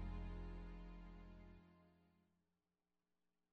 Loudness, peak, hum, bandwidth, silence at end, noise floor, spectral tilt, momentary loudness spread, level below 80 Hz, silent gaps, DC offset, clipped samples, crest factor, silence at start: -57 LUFS; -40 dBFS; none; 5.2 kHz; 1.45 s; under -90 dBFS; -7 dB/octave; 12 LU; -56 dBFS; none; under 0.1%; under 0.1%; 16 dB; 0 s